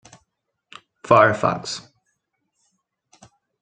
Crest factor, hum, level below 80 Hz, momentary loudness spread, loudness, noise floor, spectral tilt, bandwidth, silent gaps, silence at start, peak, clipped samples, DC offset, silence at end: 24 dB; none; -60 dBFS; 18 LU; -18 LUFS; -74 dBFS; -5 dB/octave; 9.4 kHz; none; 1.05 s; 0 dBFS; under 0.1%; under 0.1%; 1.8 s